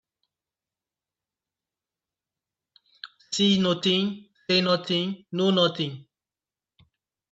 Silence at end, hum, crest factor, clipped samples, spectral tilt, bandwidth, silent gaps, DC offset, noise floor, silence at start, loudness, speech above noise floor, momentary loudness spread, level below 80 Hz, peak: 1.3 s; none; 20 dB; under 0.1%; -5 dB/octave; 8 kHz; none; under 0.1%; under -90 dBFS; 3.05 s; -24 LUFS; over 66 dB; 22 LU; -70 dBFS; -8 dBFS